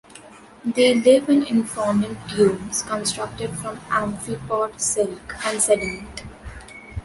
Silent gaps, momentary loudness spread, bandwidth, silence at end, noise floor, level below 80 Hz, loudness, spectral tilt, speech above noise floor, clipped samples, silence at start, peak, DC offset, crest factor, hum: none; 19 LU; 12 kHz; 0.05 s; -44 dBFS; -46 dBFS; -21 LUFS; -4 dB/octave; 23 dB; under 0.1%; 0.15 s; -4 dBFS; under 0.1%; 18 dB; none